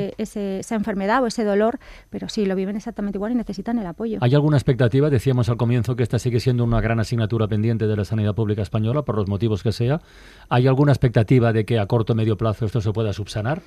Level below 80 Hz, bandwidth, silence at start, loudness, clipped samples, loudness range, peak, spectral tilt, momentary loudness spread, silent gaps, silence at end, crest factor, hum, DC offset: -42 dBFS; 12.5 kHz; 0 s; -21 LUFS; under 0.1%; 4 LU; -6 dBFS; -7.5 dB/octave; 9 LU; none; 0.05 s; 14 dB; none; under 0.1%